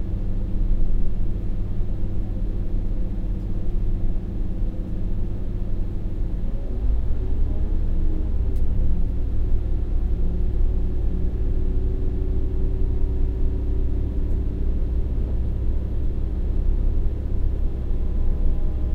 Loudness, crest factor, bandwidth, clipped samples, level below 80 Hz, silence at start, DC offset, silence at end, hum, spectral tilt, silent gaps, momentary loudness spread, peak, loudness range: -28 LUFS; 12 dB; 2.2 kHz; under 0.1%; -22 dBFS; 0 s; under 0.1%; 0 s; none; -10.5 dB/octave; none; 4 LU; -8 dBFS; 3 LU